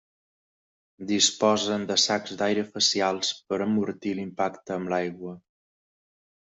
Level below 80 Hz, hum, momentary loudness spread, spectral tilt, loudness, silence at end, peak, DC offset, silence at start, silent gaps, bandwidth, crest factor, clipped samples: -70 dBFS; none; 10 LU; -3 dB/octave; -25 LUFS; 1.05 s; -6 dBFS; under 0.1%; 1 s; none; 8.2 kHz; 22 dB; under 0.1%